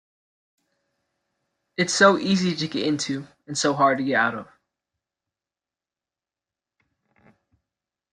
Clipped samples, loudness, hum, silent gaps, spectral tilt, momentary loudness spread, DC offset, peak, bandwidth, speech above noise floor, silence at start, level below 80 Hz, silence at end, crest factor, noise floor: under 0.1%; -22 LUFS; none; none; -4 dB/octave; 14 LU; under 0.1%; -4 dBFS; 11.5 kHz; over 68 dB; 1.8 s; -68 dBFS; 3.7 s; 24 dB; under -90 dBFS